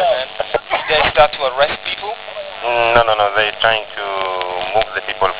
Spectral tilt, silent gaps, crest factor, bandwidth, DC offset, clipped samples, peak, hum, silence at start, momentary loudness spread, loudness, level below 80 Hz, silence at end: -6.5 dB/octave; none; 16 dB; 4 kHz; 0.3%; under 0.1%; 0 dBFS; none; 0 s; 10 LU; -16 LUFS; -42 dBFS; 0 s